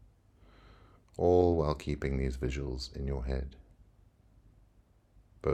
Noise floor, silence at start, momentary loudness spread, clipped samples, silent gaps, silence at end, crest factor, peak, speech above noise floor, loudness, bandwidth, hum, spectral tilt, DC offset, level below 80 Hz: -65 dBFS; 0.65 s; 13 LU; under 0.1%; none; 0 s; 20 dB; -14 dBFS; 34 dB; -32 LUFS; 11 kHz; none; -7.5 dB/octave; under 0.1%; -42 dBFS